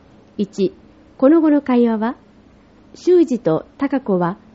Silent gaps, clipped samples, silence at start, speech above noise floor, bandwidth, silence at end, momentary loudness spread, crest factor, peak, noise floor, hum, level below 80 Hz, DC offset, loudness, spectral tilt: none; under 0.1%; 0.4 s; 32 dB; 8 kHz; 0.2 s; 11 LU; 16 dB; -2 dBFS; -48 dBFS; none; -56 dBFS; under 0.1%; -17 LUFS; -7 dB/octave